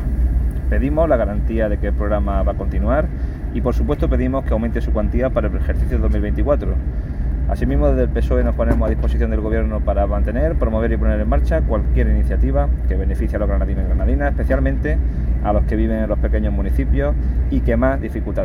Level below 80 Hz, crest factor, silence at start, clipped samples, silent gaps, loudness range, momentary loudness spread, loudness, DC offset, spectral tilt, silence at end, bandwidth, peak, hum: -18 dBFS; 14 dB; 0 s; under 0.1%; none; 1 LU; 3 LU; -19 LUFS; under 0.1%; -10 dB/octave; 0 s; 3.8 kHz; -4 dBFS; none